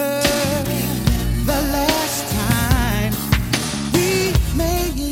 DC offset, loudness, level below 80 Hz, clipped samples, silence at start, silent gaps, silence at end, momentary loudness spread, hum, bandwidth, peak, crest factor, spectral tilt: under 0.1%; -19 LUFS; -26 dBFS; under 0.1%; 0 s; none; 0 s; 3 LU; none; 17 kHz; -2 dBFS; 18 dB; -4.5 dB/octave